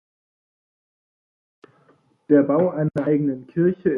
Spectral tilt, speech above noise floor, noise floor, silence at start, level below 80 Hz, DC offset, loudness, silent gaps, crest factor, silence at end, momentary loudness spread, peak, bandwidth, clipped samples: -11 dB/octave; 40 dB; -60 dBFS; 2.3 s; -62 dBFS; under 0.1%; -20 LUFS; none; 18 dB; 0 s; 6 LU; -4 dBFS; 3.6 kHz; under 0.1%